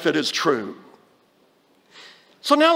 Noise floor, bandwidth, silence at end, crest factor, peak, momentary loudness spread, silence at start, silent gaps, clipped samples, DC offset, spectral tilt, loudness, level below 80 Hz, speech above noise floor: -60 dBFS; 16.5 kHz; 0 s; 22 dB; -2 dBFS; 25 LU; 0 s; none; under 0.1%; under 0.1%; -3.5 dB/octave; -21 LUFS; -80 dBFS; 41 dB